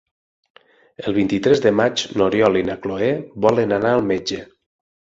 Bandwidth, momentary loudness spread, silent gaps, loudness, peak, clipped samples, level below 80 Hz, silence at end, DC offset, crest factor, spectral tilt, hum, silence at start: 7.8 kHz; 8 LU; none; -19 LUFS; -2 dBFS; under 0.1%; -52 dBFS; 0.6 s; under 0.1%; 18 dB; -5.5 dB/octave; none; 1 s